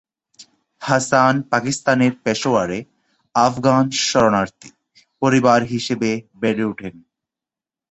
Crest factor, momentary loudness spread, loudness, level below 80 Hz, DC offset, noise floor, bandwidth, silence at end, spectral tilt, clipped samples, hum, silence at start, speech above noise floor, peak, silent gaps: 18 dB; 10 LU; -18 LUFS; -56 dBFS; under 0.1%; -89 dBFS; 8.4 kHz; 0.95 s; -4.5 dB/octave; under 0.1%; none; 0.4 s; 71 dB; -2 dBFS; none